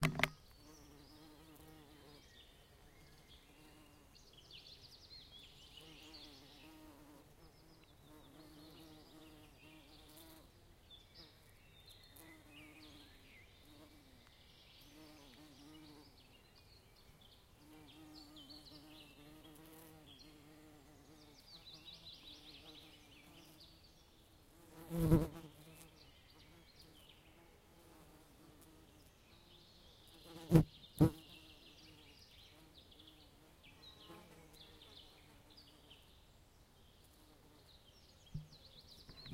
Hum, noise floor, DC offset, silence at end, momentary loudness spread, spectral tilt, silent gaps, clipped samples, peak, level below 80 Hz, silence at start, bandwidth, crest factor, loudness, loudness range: none; -66 dBFS; under 0.1%; 0 s; 11 LU; -6.5 dB/octave; none; under 0.1%; -12 dBFS; -60 dBFS; 0 s; 16 kHz; 34 dB; -43 LUFS; 22 LU